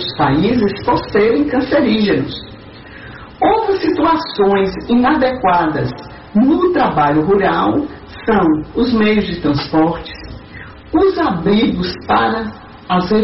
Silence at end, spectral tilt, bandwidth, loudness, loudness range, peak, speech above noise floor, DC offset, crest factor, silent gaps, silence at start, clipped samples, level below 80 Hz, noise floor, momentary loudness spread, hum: 0 s; -4.5 dB/octave; 6 kHz; -15 LUFS; 2 LU; -4 dBFS; 21 dB; under 0.1%; 10 dB; none; 0 s; under 0.1%; -38 dBFS; -35 dBFS; 17 LU; none